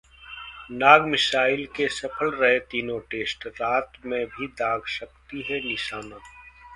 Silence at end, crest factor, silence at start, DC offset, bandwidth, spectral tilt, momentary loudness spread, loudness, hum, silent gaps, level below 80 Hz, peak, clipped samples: 0 s; 26 dB; 0.2 s; under 0.1%; 11.5 kHz; -3.5 dB/octave; 21 LU; -23 LUFS; none; none; -56 dBFS; 0 dBFS; under 0.1%